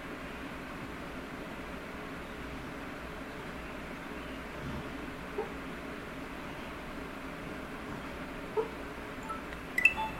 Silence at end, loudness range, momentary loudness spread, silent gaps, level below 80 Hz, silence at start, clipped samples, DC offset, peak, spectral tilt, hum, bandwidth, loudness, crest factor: 0 s; 2 LU; 6 LU; none; -52 dBFS; 0 s; under 0.1%; under 0.1%; -10 dBFS; -5 dB/octave; none; 16 kHz; -38 LUFS; 30 dB